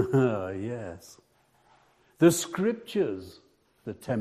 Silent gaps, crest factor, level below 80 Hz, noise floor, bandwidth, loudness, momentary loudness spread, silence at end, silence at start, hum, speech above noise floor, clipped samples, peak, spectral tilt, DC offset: none; 22 dB; -66 dBFS; -64 dBFS; 14.5 kHz; -27 LUFS; 20 LU; 0 s; 0 s; none; 37 dB; under 0.1%; -8 dBFS; -5.5 dB/octave; under 0.1%